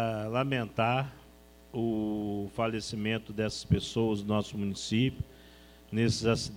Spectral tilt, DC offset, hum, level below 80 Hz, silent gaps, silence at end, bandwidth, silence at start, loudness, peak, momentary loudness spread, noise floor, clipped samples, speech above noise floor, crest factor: -5.5 dB/octave; under 0.1%; none; -52 dBFS; none; 0 s; 16.5 kHz; 0 s; -31 LUFS; -12 dBFS; 6 LU; -55 dBFS; under 0.1%; 25 dB; 20 dB